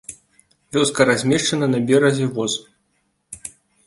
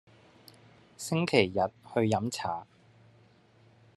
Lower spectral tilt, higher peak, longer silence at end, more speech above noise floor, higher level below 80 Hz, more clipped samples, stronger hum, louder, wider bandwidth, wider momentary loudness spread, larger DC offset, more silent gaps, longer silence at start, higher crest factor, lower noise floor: about the same, -4.5 dB/octave vs -5 dB/octave; first, -2 dBFS vs -6 dBFS; second, 0.4 s vs 1.35 s; first, 50 dB vs 32 dB; first, -58 dBFS vs -70 dBFS; neither; neither; first, -18 LUFS vs -30 LUFS; about the same, 11.5 kHz vs 12.5 kHz; first, 19 LU vs 11 LU; neither; neither; second, 0.1 s vs 1 s; second, 18 dB vs 26 dB; first, -68 dBFS vs -61 dBFS